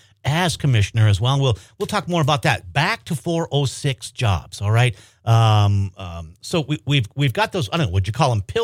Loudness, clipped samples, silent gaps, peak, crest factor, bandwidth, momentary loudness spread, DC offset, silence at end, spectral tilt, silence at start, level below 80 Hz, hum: -20 LUFS; under 0.1%; none; -4 dBFS; 16 dB; 15 kHz; 8 LU; under 0.1%; 0 s; -5.5 dB/octave; 0.25 s; -44 dBFS; none